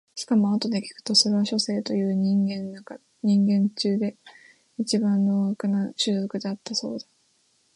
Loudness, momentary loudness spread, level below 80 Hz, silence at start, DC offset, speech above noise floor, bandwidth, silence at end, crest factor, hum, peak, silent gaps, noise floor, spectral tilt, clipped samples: -24 LUFS; 12 LU; -72 dBFS; 0.15 s; under 0.1%; 42 dB; 11 kHz; 0.75 s; 18 dB; none; -6 dBFS; none; -66 dBFS; -5 dB/octave; under 0.1%